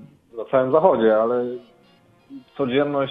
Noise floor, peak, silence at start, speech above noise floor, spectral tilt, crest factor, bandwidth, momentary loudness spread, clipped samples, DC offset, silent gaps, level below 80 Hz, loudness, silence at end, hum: -55 dBFS; -2 dBFS; 0 s; 36 dB; -9 dB/octave; 18 dB; 4.5 kHz; 20 LU; under 0.1%; under 0.1%; none; -62 dBFS; -20 LUFS; 0 s; none